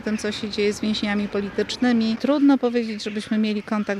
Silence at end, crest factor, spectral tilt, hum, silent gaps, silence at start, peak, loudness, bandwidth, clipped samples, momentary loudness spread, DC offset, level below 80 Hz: 0 s; 14 dB; -5 dB/octave; none; none; 0 s; -8 dBFS; -22 LUFS; 11.5 kHz; under 0.1%; 8 LU; under 0.1%; -56 dBFS